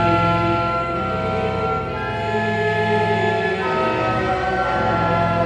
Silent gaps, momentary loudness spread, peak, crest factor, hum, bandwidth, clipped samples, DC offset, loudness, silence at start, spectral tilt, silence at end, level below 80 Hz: none; 4 LU; -6 dBFS; 14 dB; none; 10 kHz; under 0.1%; under 0.1%; -20 LUFS; 0 s; -7 dB/octave; 0 s; -38 dBFS